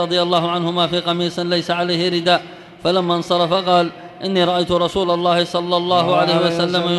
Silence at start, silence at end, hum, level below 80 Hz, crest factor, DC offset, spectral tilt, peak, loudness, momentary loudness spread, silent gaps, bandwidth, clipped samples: 0 s; 0 s; none; -52 dBFS; 14 dB; under 0.1%; -5.5 dB/octave; -2 dBFS; -17 LUFS; 5 LU; none; 12 kHz; under 0.1%